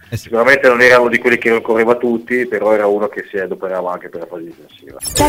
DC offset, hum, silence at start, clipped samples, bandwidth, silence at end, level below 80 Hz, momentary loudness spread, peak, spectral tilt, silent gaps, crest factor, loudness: under 0.1%; none; 0.1 s; under 0.1%; 16 kHz; 0 s; -42 dBFS; 17 LU; 0 dBFS; -4 dB/octave; none; 14 dB; -13 LUFS